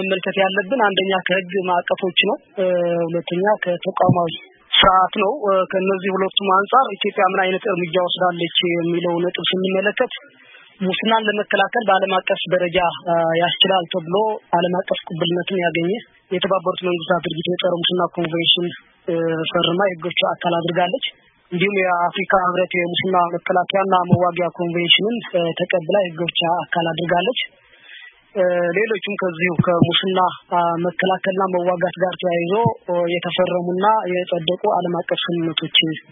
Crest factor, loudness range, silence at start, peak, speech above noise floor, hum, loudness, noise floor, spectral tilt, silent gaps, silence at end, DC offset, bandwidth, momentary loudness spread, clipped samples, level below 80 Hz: 18 dB; 3 LU; 0 s; 0 dBFS; 24 dB; none; -19 LUFS; -43 dBFS; -10.5 dB/octave; none; 0.1 s; under 0.1%; 3.9 kHz; 6 LU; under 0.1%; -54 dBFS